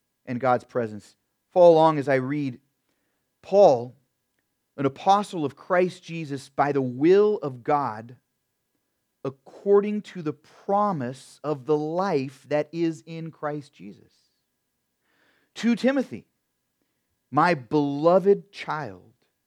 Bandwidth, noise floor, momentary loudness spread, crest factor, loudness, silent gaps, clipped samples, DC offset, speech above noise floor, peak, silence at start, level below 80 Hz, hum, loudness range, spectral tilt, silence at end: 11 kHz; -77 dBFS; 17 LU; 20 dB; -23 LUFS; none; under 0.1%; under 0.1%; 54 dB; -4 dBFS; 0.25 s; -78 dBFS; none; 9 LU; -7 dB/octave; 0.5 s